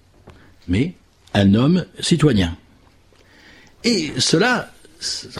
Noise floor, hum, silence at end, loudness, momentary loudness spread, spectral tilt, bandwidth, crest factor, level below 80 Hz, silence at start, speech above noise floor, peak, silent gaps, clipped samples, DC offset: -52 dBFS; none; 0 s; -19 LUFS; 10 LU; -5 dB/octave; 13 kHz; 18 dB; -44 dBFS; 0.25 s; 34 dB; -2 dBFS; none; under 0.1%; under 0.1%